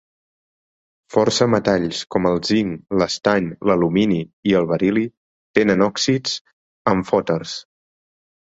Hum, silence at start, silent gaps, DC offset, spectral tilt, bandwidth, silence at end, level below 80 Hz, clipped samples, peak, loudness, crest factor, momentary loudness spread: none; 1.1 s; 4.33-4.43 s, 5.17-5.54 s, 6.41-6.45 s, 6.53-6.85 s; under 0.1%; -5 dB/octave; 8 kHz; 0.95 s; -52 dBFS; under 0.1%; 0 dBFS; -19 LUFS; 20 dB; 7 LU